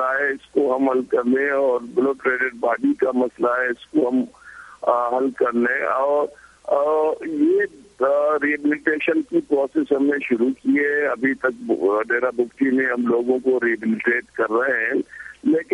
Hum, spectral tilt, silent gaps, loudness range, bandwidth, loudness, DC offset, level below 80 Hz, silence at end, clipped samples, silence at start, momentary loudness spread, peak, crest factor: none; -6.5 dB/octave; none; 1 LU; 11 kHz; -21 LUFS; under 0.1%; -64 dBFS; 0 s; under 0.1%; 0 s; 4 LU; -4 dBFS; 16 dB